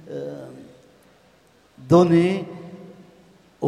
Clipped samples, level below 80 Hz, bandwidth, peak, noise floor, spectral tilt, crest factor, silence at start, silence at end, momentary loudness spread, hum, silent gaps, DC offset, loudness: under 0.1%; -60 dBFS; 10.5 kHz; -4 dBFS; -56 dBFS; -8 dB/octave; 20 dB; 0.1 s; 0 s; 26 LU; none; none; under 0.1%; -19 LUFS